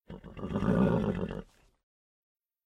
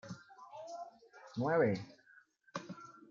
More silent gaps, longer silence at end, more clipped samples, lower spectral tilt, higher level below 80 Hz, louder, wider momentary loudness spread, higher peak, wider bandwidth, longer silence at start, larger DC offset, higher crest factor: neither; first, 1.25 s vs 0.1 s; neither; first, -9 dB/octave vs -7 dB/octave; first, -48 dBFS vs -80 dBFS; first, -30 LUFS vs -38 LUFS; second, 17 LU vs 21 LU; first, -16 dBFS vs -20 dBFS; first, 9.4 kHz vs 7.4 kHz; about the same, 0.1 s vs 0.05 s; neither; about the same, 18 dB vs 20 dB